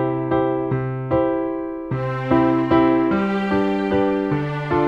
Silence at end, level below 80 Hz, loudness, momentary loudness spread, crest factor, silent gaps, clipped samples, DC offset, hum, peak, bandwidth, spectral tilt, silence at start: 0 s; -44 dBFS; -20 LUFS; 8 LU; 16 dB; none; under 0.1%; under 0.1%; none; -4 dBFS; 6 kHz; -9 dB/octave; 0 s